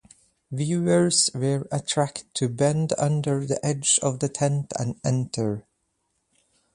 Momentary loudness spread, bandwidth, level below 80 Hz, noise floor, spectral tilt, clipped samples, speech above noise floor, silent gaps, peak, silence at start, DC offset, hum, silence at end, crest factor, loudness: 8 LU; 11.5 kHz; -60 dBFS; -74 dBFS; -4.5 dB/octave; under 0.1%; 50 dB; none; -6 dBFS; 0.5 s; under 0.1%; none; 1.15 s; 20 dB; -24 LUFS